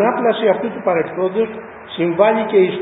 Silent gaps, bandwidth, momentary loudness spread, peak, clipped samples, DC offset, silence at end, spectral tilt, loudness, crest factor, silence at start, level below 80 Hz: none; 4 kHz; 8 LU; 0 dBFS; under 0.1%; under 0.1%; 0 s; -11 dB/octave; -17 LUFS; 16 dB; 0 s; -60 dBFS